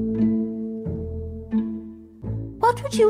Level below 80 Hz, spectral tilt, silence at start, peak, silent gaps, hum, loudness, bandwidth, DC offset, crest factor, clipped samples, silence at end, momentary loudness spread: -44 dBFS; -7 dB/octave; 0 s; -8 dBFS; none; none; -26 LUFS; 14 kHz; under 0.1%; 14 dB; under 0.1%; 0 s; 12 LU